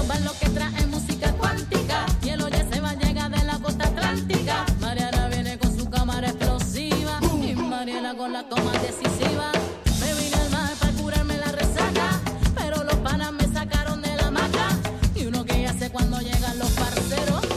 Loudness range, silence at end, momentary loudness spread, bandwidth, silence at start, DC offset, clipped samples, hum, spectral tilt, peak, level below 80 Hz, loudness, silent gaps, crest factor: 1 LU; 0 s; 3 LU; 16 kHz; 0 s; under 0.1%; under 0.1%; none; -5 dB/octave; -6 dBFS; -28 dBFS; -24 LUFS; none; 18 dB